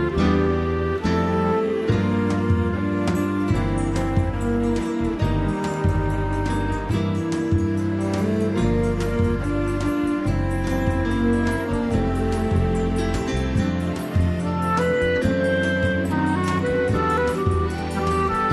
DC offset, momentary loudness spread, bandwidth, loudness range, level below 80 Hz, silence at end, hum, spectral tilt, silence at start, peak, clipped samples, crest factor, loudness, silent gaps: under 0.1%; 3 LU; 12.5 kHz; 2 LU; -32 dBFS; 0 s; none; -7 dB/octave; 0 s; -8 dBFS; under 0.1%; 14 dB; -22 LUFS; none